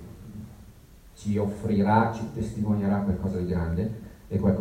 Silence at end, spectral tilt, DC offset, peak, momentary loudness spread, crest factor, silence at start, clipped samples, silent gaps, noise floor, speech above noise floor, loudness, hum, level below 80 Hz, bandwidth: 0 s; -8.5 dB/octave; under 0.1%; -6 dBFS; 20 LU; 20 dB; 0 s; under 0.1%; none; -50 dBFS; 25 dB; -27 LUFS; none; -44 dBFS; 13 kHz